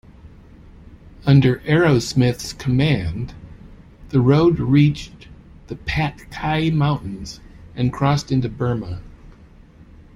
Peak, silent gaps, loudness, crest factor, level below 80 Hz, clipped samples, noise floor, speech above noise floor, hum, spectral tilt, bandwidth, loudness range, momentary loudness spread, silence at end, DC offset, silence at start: -2 dBFS; none; -19 LUFS; 18 dB; -40 dBFS; under 0.1%; -45 dBFS; 27 dB; none; -7 dB/octave; 12 kHz; 4 LU; 18 LU; 0.85 s; under 0.1%; 0.25 s